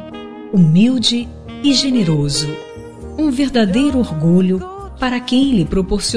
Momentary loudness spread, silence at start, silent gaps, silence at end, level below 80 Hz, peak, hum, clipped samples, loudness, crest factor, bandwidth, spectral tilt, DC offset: 17 LU; 0 s; none; 0 s; -34 dBFS; -2 dBFS; none; under 0.1%; -15 LUFS; 14 dB; 11 kHz; -5.5 dB/octave; 1%